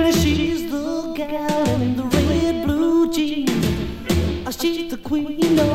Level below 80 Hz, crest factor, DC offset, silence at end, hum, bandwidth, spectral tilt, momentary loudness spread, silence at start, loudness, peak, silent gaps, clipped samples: -34 dBFS; 16 dB; under 0.1%; 0 s; none; 16 kHz; -5.5 dB/octave; 7 LU; 0 s; -21 LUFS; -2 dBFS; none; under 0.1%